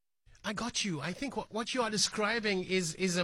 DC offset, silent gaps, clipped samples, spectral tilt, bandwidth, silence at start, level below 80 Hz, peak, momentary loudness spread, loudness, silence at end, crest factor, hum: under 0.1%; none; under 0.1%; -3 dB/octave; 16 kHz; 0.45 s; -62 dBFS; -16 dBFS; 8 LU; -33 LUFS; 0 s; 18 dB; none